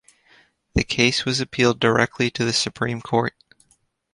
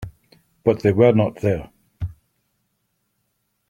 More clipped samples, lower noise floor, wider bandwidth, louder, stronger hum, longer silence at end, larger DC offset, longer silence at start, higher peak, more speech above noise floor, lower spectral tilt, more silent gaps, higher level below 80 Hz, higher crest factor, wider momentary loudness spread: neither; second, -64 dBFS vs -72 dBFS; first, 11.5 kHz vs 10 kHz; about the same, -21 LUFS vs -19 LUFS; neither; second, 0.85 s vs 1.6 s; neither; first, 0.75 s vs 0 s; about the same, -2 dBFS vs -2 dBFS; second, 43 dB vs 55 dB; second, -4 dB/octave vs -9 dB/octave; neither; first, -42 dBFS vs -48 dBFS; about the same, 22 dB vs 20 dB; second, 7 LU vs 18 LU